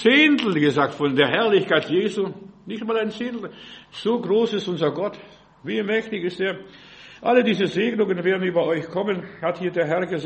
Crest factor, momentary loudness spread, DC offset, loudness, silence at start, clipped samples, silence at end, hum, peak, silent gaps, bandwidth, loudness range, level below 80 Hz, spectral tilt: 20 dB; 12 LU; under 0.1%; -22 LUFS; 0 s; under 0.1%; 0 s; none; -2 dBFS; none; 8.4 kHz; 4 LU; -64 dBFS; -6 dB/octave